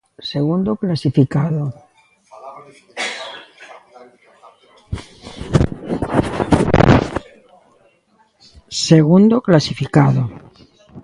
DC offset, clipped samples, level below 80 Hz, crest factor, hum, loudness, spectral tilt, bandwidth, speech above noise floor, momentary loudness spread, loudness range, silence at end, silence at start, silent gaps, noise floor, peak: under 0.1%; under 0.1%; -36 dBFS; 18 dB; none; -16 LUFS; -6.5 dB/octave; 11.5 kHz; 43 dB; 20 LU; 15 LU; 0.05 s; 0.2 s; none; -58 dBFS; 0 dBFS